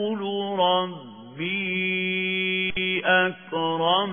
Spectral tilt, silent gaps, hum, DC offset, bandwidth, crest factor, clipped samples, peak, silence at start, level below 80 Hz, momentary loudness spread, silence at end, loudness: -8 dB/octave; none; none; under 0.1%; 3.6 kHz; 18 dB; under 0.1%; -6 dBFS; 0 s; -58 dBFS; 9 LU; 0 s; -24 LUFS